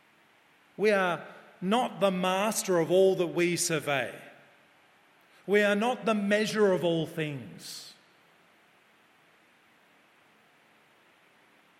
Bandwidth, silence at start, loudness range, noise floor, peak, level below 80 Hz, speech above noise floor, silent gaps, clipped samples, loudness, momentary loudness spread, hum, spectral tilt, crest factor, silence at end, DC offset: 16 kHz; 0.8 s; 8 LU; -63 dBFS; -12 dBFS; -80 dBFS; 36 dB; none; under 0.1%; -27 LUFS; 17 LU; none; -4.5 dB/octave; 20 dB; 3.9 s; under 0.1%